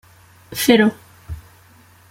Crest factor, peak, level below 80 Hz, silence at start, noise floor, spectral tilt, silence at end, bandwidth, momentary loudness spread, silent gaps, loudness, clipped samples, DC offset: 20 dB; -2 dBFS; -46 dBFS; 0.5 s; -49 dBFS; -4 dB/octave; 0.7 s; 16.5 kHz; 22 LU; none; -16 LUFS; under 0.1%; under 0.1%